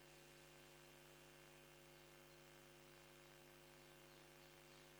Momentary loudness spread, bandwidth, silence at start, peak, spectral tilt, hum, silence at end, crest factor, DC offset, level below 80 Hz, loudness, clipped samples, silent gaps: 0 LU; over 20 kHz; 0 s; -48 dBFS; -3 dB/octave; none; 0 s; 16 dB; under 0.1%; -80 dBFS; -64 LUFS; under 0.1%; none